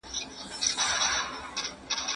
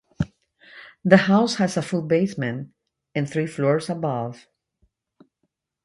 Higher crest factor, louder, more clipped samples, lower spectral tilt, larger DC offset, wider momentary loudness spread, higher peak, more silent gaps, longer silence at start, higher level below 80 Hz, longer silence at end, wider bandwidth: about the same, 22 dB vs 24 dB; second, -29 LUFS vs -22 LUFS; neither; second, 1 dB/octave vs -6.5 dB/octave; neither; second, 10 LU vs 14 LU; second, -10 dBFS vs 0 dBFS; neither; second, 0.05 s vs 0.2 s; about the same, -56 dBFS vs -54 dBFS; second, 0 s vs 1.5 s; about the same, 11.5 kHz vs 11.5 kHz